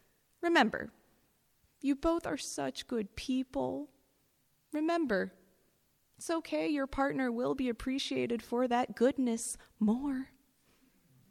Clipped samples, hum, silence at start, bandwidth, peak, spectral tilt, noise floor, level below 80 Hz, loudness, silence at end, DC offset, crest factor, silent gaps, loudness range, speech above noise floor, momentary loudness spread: under 0.1%; none; 0.4 s; 15.5 kHz; -12 dBFS; -4 dB/octave; -74 dBFS; -60 dBFS; -34 LUFS; 1.05 s; under 0.1%; 22 dB; none; 4 LU; 41 dB; 10 LU